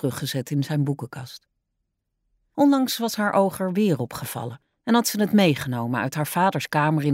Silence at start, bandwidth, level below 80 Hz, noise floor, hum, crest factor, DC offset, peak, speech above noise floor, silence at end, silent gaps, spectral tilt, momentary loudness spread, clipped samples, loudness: 0 s; 16 kHz; -64 dBFS; -78 dBFS; none; 16 dB; under 0.1%; -8 dBFS; 55 dB; 0 s; none; -5.5 dB/octave; 14 LU; under 0.1%; -23 LUFS